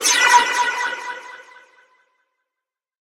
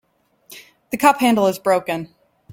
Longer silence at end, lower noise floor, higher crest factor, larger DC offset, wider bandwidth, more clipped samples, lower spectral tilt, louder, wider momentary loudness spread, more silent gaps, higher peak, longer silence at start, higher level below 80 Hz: first, 1.6 s vs 0 s; first, -86 dBFS vs -53 dBFS; about the same, 22 dB vs 18 dB; neither; about the same, 16 kHz vs 17 kHz; neither; second, 2.5 dB/octave vs -4.5 dB/octave; about the same, -16 LUFS vs -18 LUFS; first, 21 LU vs 14 LU; neither; about the same, 0 dBFS vs -2 dBFS; second, 0 s vs 0.5 s; second, -70 dBFS vs -62 dBFS